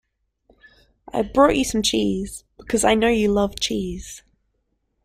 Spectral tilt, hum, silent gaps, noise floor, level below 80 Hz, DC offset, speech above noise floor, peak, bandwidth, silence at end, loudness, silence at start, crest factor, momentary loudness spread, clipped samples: -4 dB/octave; none; none; -71 dBFS; -42 dBFS; under 0.1%; 51 dB; -2 dBFS; 16 kHz; 0.85 s; -20 LUFS; 1.15 s; 20 dB; 17 LU; under 0.1%